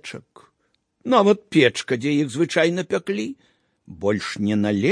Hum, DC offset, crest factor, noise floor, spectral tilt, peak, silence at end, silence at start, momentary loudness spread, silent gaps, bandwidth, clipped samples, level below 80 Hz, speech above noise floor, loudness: none; under 0.1%; 20 dB; -68 dBFS; -5.5 dB/octave; -2 dBFS; 0 s; 0.05 s; 12 LU; none; 10.5 kHz; under 0.1%; -64 dBFS; 48 dB; -21 LUFS